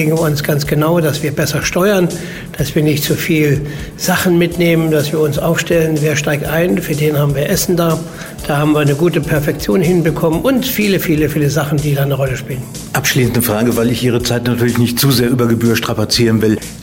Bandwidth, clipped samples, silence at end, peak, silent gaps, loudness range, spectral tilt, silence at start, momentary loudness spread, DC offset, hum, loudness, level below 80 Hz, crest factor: 16.5 kHz; under 0.1%; 0 s; -2 dBFS; none; 1 LU; -5.5 dB/octave; 0 s; 5 LU; under 0.1%; none; -14 LUFS; -36 dBFS; 10 dB